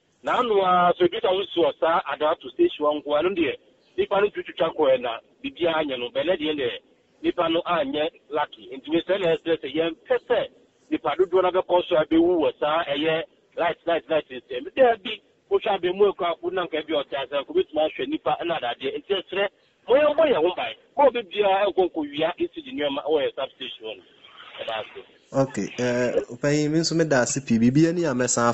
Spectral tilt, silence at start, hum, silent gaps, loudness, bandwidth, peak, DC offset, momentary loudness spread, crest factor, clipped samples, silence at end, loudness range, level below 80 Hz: -4.5 dB/octave; 0.25 s; none; none; -24 LUFS; 8.4 kHz; -8 dBFS; under 0.1%; 11 LU; 16 dB; under 0.1%; 0 s; 4 LU; -58 dBFS